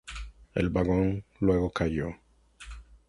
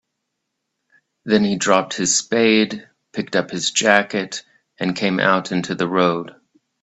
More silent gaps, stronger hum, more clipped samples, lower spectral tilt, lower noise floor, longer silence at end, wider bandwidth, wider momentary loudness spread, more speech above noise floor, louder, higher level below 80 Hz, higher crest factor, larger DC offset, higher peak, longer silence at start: neither; neither; neither; first, -7.5 dB/octave vs -3.5 dB/octave; second, -49 dBFS vs -77 dBFS; second, 0.15 s vs 0.5 s; first, 11.5 kHz vs 8.4 kHz; first, 21 LU vs 14 LU; second, 22 dB vs 58 dB; second, -29 LUFS vs -18 LUFS; first, -42 dBFS vs -62 dBFS; about the same, 18 dB vs 20 dB; neither; second, -12 dBFS vs 0 dBFS; second, 0.05 s vs 1.25 s